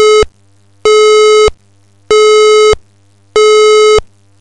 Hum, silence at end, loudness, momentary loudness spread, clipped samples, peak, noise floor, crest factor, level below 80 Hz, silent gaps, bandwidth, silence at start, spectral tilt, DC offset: none; 0.35 s; -7 LUFS; 9 LU; under 0.1%; 0 dBFS; -48 dBFS; 8 dB; -30 dBFS; none; 9.6 kHz; 0 s; -1.5 dB/octave; 0.7%